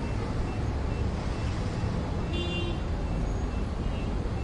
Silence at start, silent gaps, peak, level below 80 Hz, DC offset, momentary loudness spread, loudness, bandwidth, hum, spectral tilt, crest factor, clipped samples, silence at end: 0 s; none; -18 dBFS; -34 dBFS; under 0.1%; 2 LU; -32 LUFS; 11 kHz; none; -7 dB/octave; 12 dB; under 0.1%; 0 s